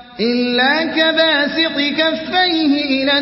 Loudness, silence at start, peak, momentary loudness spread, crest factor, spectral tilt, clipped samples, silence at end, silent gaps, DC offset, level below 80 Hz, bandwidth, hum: -14 LUFS; 0 s; -2 dBFS; 3 LU; 14 dB; -7 dB/octave; under 0.1%; 0 s; none; under 0.1%; -54 dBFS; 5.8 kHz; none